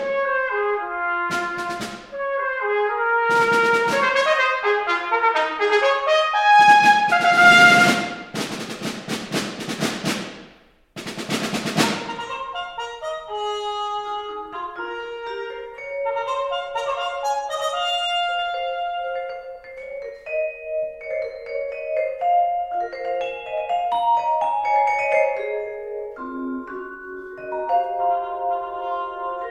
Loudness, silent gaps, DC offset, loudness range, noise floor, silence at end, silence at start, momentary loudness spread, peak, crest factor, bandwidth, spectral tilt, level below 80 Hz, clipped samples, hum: -21 LUFS; none; under 0.1%; 13 LU; -52 dBFS; 0 s; 0 s; 15 LU; 0 dBFS; 20 dB; 16 kHz; -3 dB/octave; -58 dBFS; under 0.1%; none